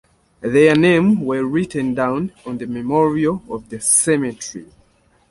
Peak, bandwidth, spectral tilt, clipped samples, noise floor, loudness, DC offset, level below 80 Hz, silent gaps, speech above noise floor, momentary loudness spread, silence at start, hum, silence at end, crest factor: -2 dBFS; 12 kHz; -4.5 dB/octave; under 0.1%; -57 dBFS; -17 LUFS; under 0.1%; -52 dBFS; none; 40 dB; 15 LU; 0.4 s; none; 0.65 s; 16 dB